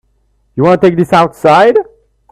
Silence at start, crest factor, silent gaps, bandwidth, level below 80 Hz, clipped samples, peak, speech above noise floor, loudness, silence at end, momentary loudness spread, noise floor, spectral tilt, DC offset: 0.55 s; 10 dB; none; 14 kHz; -48 dBFS; under 0.1%; 0 dBFS; 48 dB; -9 LUFS; 0.5 s; 12 LU; -56 dBFS; -7 dB/octave; under 0.1%